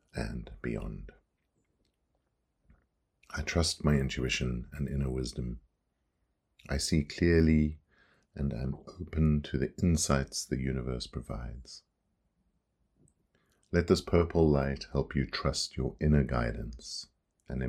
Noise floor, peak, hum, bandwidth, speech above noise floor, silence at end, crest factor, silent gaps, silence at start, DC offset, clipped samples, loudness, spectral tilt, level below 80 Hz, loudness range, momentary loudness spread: -79 dBFS; -10 dBFS; none; 14.5 kHz; 49 dB; 0 s; 22 dB; none; 0.15 s; under 0.1%; under 0.1%; -31 LUFS; -5.5 dB/octave; -42 dBFS; 9 LU; 15 LU